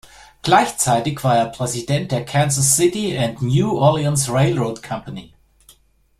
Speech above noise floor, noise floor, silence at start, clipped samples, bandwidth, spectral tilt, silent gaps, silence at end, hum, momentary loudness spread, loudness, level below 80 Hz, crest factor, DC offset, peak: 36 dB; -53 dBFS; 0.45 s; under 0.1%; 15 kHz; -4.5 dB/octave; none; 0.95 s; none; 13 LU; -18 LUFS; -48 dBFS; 16 dB; under 0.1%; -2 dBFS